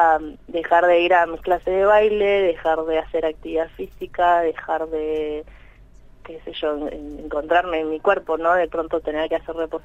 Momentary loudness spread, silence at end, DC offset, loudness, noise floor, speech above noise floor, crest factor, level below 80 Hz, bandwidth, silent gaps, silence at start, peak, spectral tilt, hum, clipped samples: 13 LU; 0.05 s; under 0.1%; -21 LUFS; -46 dBFS; 26 dB; 16 dB; -46 dBFS; 8 kHz; none; 0 s; -4 dBFS; -5.5 dB/octave; none; under 0.1%